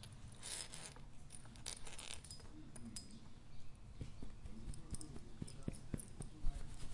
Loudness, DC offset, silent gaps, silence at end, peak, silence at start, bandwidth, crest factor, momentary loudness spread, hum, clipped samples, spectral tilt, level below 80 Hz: -52 LUFS; under 0.1%; none; 0 s; -24 dBFS; 0 s; 11.5 kHz; 22 dB; 11 LU; none; under 0.1%; -3.5 dB/octave; -52 dBFS